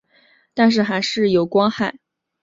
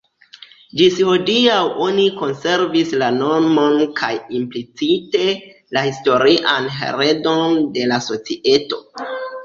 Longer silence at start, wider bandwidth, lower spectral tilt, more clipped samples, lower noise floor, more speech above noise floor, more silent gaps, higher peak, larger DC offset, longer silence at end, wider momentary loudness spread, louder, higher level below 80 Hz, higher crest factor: second, 0.55 s vs 0.75 s; about the same, 7.6 kHz vs 7.4 kHz; about the same, -5.5 dB/octave vs -4.5 dB/octave; neither; first, -57 dBFS vs -44 dBFS; first, 40 dB vs 27 dB; neither; about the same, -2 dBFS vs -2 dBFS; neither; first, 0.5 s vs 0 s; about the same, 9 LU vs 10 LU; about the same, -18 LUFS vs -17 LUFS; about the same, -60 dBFS vs -60 dBFS; about the same, 16 dB vs 16 dB